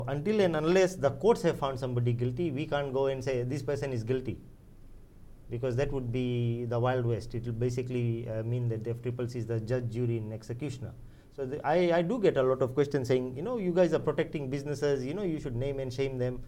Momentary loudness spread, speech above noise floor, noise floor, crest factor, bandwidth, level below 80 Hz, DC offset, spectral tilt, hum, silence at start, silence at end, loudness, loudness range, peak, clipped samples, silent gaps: 9 LU; 20 dB; -50 dBFS; 18 dB; 12 kHz; -50 dBFS; under 0.1%; -7.5 dB/octave; none; 0 s; 0 s; -31 LUFS; 6 LU; -12 dBFS; under 0.1%; none